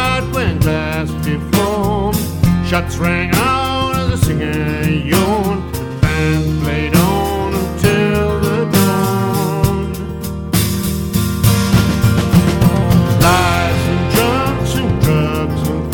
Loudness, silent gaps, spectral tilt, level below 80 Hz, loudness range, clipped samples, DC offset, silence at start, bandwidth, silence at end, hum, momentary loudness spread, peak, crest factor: -15 LUFS; none; -5.5 dB/octave; -26 dBFS; 3 LU; under 0.1%; under 0.1%; 0 s; 17.5 kHz; 0 s; none; 6 LU; 0 dBFS; 14 dB